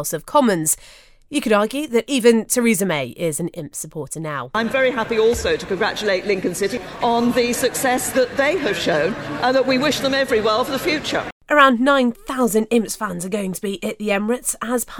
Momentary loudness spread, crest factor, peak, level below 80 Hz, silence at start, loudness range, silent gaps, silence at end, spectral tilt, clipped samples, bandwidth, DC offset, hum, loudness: 9 LU; 20 dB; 0 dBFS; -46 dBFS; 0 s; 3 LU; 11.32-11.41 s; 0 s; -3.5 dB/octave; under 0.1%; over 20 kHz; under 0.1%; none; -19 LUFS